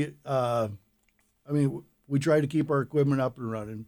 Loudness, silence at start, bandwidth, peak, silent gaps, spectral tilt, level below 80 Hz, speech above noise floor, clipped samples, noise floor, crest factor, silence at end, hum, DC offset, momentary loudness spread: -28 LUFS; 0 s; 18 kHz; -12 dBFS; none; -7.5 dB/octave; -64 dBFS; 43 dB; under 0.1%; -70 dBFS; 16 dB; 0.05 s; none; under 0.1%; 10 LU